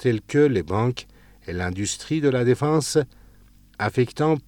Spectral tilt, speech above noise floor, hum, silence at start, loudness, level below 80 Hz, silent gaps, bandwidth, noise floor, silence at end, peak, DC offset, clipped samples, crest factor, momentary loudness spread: -5.5 dB/octave; 30 dB; none; 0 s; -23 LUFS; -52 dBFS; none; 17.5 kHz; -52 dBFS; 0.05 s; -6 dBFS; under 0.1%; under 0.1%; 16 dB; 12 LU